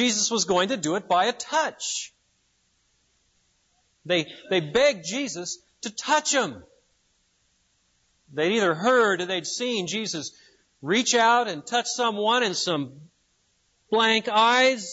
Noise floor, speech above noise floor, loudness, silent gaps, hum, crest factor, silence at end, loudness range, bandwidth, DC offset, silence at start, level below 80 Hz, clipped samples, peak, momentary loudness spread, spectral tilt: -69 dBFS; 45 dB; -23 LUFS; none; none; 18 dB; 0 s; 5 LU; 8 kHz; under 0.1%; 0 s; -68 dBFS; under 0.1%; -8 dBFS; 12 LU; -2.5 dB/octave